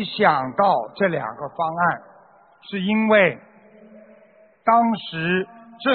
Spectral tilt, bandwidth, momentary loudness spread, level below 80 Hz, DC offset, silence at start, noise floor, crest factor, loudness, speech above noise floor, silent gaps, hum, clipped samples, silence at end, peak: -3.5 dB/octave; 4.6 kHz; 13 LU; -64 dBFS; under 0.1%; 0 s; -53 dBFS; 20 dB; -21 LUFS; 33 dB; none; none; under 0.1%; 0 s; -2 dBFS